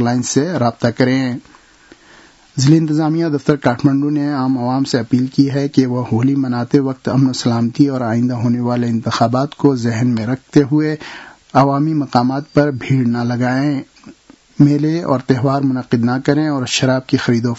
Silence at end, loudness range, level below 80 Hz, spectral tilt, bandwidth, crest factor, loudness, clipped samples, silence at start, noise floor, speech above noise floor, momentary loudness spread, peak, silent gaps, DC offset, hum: 0 s; 1 LU; -54 dBFS; -6.5 dB/octave; 8 kHz; 16 dB; -16 LUFS; under 0.1%; 0 s; -46 dBFS; 31 dB; 4 LU; 0 dBFS; none; under 0.1%; none